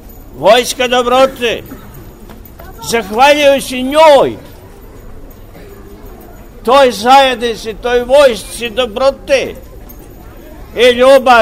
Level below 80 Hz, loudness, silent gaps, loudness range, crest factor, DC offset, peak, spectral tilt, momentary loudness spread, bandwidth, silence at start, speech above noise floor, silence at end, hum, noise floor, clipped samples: -36 dBFS; -10 LUFS; none; 3 LU; 12 dB; 0.4%; 0 dBFS; -3 dB/octave; 14 LU; 16 kHz; 0.05 s; 24 dB; 0 s; none; -33 dBFS; 0.3%